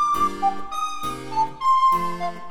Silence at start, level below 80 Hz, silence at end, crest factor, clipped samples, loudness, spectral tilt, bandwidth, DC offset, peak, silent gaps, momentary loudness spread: 0 s; -50 dBFS; 0 s; 12 dB; under 0.1%; -22 LUFS; -4 dB/octave; 18 kHz; under 0.1%; -10 dBFS; none; 10 LU